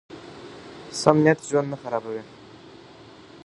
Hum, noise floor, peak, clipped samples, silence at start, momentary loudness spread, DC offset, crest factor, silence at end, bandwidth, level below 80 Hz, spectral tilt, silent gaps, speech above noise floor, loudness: none; -47 dBFS; 0 dBFS; under 0.1%; 0.1 s; 23 LU; under 0.1%; 26 dB; 0.1 s; 11.5 kHz; -64 dBFS; -5.5 dB/octave; none; 25 dB; -23 LUFS